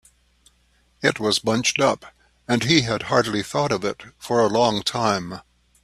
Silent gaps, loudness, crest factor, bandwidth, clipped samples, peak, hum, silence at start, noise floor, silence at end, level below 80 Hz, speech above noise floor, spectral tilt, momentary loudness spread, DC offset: none; -21 LUFS; 22 dB; 14 kHz; under 0.1%; 0 dBFS; 60 Hz at -50 dBFS; 1 s; -62 dBFS; 0.45 s; -54 dBFS; 40 dB; -4 dB/octave; 10 LU; under 0.1%